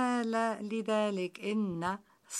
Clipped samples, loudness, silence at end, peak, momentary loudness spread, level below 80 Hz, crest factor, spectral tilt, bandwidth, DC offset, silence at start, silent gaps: under 0.1%; -33 LUFS; 0 s; -20 dBFS; 6 LU; -74 dBFS; 14 dB; -5 dB/octave; 14.5 kHz; under 0.1%; 0 s; none